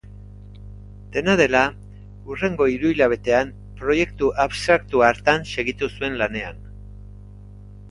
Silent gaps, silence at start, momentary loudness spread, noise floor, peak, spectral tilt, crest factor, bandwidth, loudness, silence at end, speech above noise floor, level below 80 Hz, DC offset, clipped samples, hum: none; 0.05 s; 24 LU; -41 dBFS; -2 dBFS; -5 dB/octave; 22 dB; 11.5 kHz; -20 LUFS; 0 s; 21 dB; -42 dBFS; under 0.1%; under 0.1%; 50 Hz at -40 dBFS